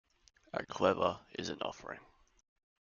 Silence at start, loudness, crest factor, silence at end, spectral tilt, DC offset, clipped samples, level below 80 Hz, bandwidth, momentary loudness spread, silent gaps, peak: 0.55 s; -36 LUFS; 26 dB; 0.8 s; -3.5 dB/octave; under 0.1%; under 0.1%; -70 dBFS; 7.2 kHz; 17 LU; none; -14 dBFS